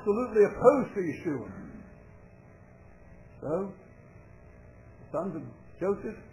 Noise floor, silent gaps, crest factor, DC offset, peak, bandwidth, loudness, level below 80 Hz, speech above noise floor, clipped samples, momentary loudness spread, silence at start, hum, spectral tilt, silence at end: -53 dBFS; none; 24 dB; under 0.1%; -8 dBFS; 10.5 kHz; -29 LUFS; -58 dBFS; 25 dB; under 0.1%; 21 LU; 0 s; none; -8.5 dB/octave; 0.05 s